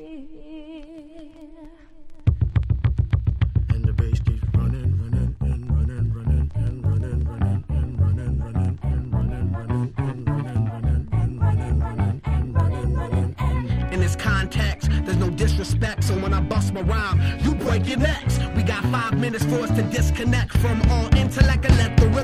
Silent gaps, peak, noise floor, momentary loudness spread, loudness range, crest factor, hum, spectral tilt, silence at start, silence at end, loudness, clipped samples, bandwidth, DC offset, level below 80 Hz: none; -2 dBFS; -43 dBFS; 6 LU; 3 LU; 18 dB; none; -6.5 dB/octave; 0 s; 0 s; -22 LUFS; under 0.1%; 14 kHz; under 0.1%; -28 dBFS